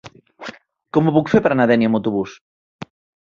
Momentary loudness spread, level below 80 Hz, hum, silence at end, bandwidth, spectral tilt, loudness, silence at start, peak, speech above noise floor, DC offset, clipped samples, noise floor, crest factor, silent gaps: 23 LU; -56 dBFS; none; 0.4 s; 7.2 kHz; -8 dB/octave; -17 LUFS; 0.05 s; -2 dBFS; 21 dB; under 0.1%; under 0.1%; -37 dBFS; 18 dB; 2.41-2.79 s